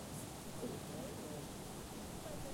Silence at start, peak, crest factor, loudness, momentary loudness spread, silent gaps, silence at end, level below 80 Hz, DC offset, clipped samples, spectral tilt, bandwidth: 0 s; -32 dBFS; 14 dB; -47 LUFS; 2 LU; none; 0 s; -60 dBFS; under 0.1%; under 0.1%; -4.5 dB/octave; 16.5 kHz